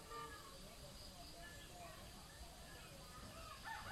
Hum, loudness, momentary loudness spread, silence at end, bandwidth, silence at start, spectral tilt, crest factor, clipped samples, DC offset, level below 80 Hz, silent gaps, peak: none; -55 LUFS; 5 LU; 0 s; 16 kHz; 0 s; -3 dB/octave; 16 dB; under 0.1%; under 0.1%; -62 dBFS; none; -38 dBFS